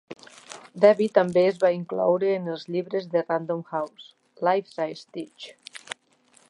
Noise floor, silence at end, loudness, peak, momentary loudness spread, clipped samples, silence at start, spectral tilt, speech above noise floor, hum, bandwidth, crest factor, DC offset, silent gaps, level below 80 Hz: -61 dBFS; 0.55 s; -24 LUFS; -4 dBFS; 22 LU; under 0.1%; 0.1 s; -6 dB/octave; 37 dB; none; 11.5 kHz; 20 dB; under 0.1%; none; -76 dBFS